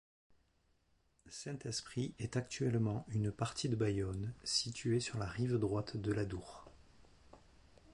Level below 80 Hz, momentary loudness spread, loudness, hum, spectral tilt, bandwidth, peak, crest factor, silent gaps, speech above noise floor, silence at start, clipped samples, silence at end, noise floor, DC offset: -60 dBFS; 10 LU; -39 LUFS; none; -5.5 dB/octave; 11.5 kHz; -20 dBFS; 18 dB; none; 38 dB; 1.25 s; under 0.1%; 0.55 s; -76 dBFS; under 0.1%